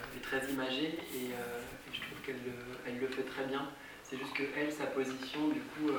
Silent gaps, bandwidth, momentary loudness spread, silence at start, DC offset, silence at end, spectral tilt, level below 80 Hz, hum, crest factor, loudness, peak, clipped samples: none; over 20 kHz; 8 LU; 0 s; under 0.1%; 0 s; -4 dB/octave; -66 dBFS; none; 16 dB; -39 LUFS; -24 dBFS; under 0.1%